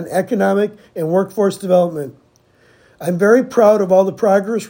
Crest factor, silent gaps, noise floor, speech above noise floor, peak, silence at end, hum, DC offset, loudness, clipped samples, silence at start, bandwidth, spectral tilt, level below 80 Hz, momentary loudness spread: 16 dB; none; -53 dBFS; 38 dB; 0 dBFS; 0 s; none; under 0.1%; -15 LUFS; under 0.1%; 0 s; 16.5 kHz; -6.5 dB/octave; -64 dBFS; 11 LU